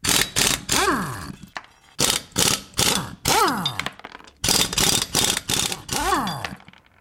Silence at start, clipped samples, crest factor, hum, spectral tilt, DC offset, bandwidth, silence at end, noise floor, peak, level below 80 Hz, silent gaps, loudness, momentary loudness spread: 0.05 s; under 0.1%; 20 dB; none; -1.5 dB/octave; under 0.1%; 17 kHz; 0.45 s; -43 dBFS; -4 dBFS; -42 dBFS; none; -20 LUFS; 16 LU